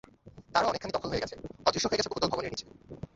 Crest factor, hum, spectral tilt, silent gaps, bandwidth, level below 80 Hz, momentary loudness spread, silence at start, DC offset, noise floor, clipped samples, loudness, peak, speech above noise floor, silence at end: 24 dB; none; -3.5 dB/octave; none; 8.2 kHz; -54 dBFS; 12 LU; 0.25 s; under 0.1%; -53 dBFS; under 0.1%; -31 LUFS; -8 dBFS; 22 dB; 0.1 s